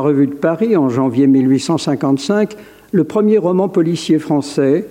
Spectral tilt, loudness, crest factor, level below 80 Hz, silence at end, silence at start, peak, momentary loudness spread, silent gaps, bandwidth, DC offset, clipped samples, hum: -7 dB/octave; -15 LUFS; 10 dB; -60 dBFS; 0 s; 0 s; -4 dBFS; 5 LU; none; 11.5 kHz; under 0.1%; under 0.1%; none